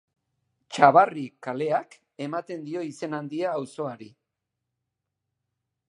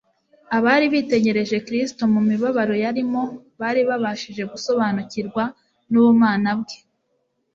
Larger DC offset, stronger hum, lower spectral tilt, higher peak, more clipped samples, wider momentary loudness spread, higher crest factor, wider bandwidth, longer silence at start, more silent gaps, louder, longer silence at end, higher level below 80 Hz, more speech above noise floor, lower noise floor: neither; neither; about the same, -6 dB/octave vs -6 dB/octave; about the same, -2 dBFS vs -2 dBFS; neither; first, 17 LU vs 12 LU; first, 26 dB vs 18 dB; first, 11 kHz vs 7.6 kHz; first, 0.7 s vs 0.5 s; neither; second, -25 LUFS vs -20 LUFS; first, 1.85 s vs 0.8 s; second, -76 dBFS vs -62 dBFS; first, 59 dB vs 50 dB; first, -83 dBFS vs -70 dBFS